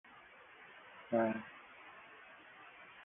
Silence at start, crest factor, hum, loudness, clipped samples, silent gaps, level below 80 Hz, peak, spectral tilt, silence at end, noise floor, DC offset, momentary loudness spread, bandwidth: 0.1 s; 22 dB; none; -37 LUFS; under 0.1%; none; -82 dBFS; -22 dBFS; -2 dB/octave; 0 s; -59 dBFS; under 0.1%; 22 LU; 3.7 kHz